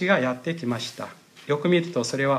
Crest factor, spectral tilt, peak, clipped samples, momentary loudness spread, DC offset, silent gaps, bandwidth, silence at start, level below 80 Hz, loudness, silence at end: 18 dB; -5.5 dB/octave; -6 dBFS; under 0.1%; 16 LU; under 0.1%; none; 14.5 kHz; 0 s; -72 dBFS; -25 LUFS; 0 s